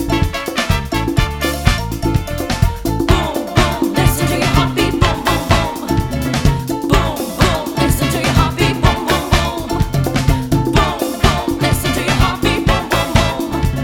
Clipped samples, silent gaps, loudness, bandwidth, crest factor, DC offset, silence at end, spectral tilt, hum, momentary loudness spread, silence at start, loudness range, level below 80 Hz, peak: under 0.1%; none; -16 LUFS; over 20 kHz; 14 dB; under 0.1%; 0 s; -5 dB/octave; none; 4 LU; 0 s; 1 LU; -22 dBFS; 0 dBFS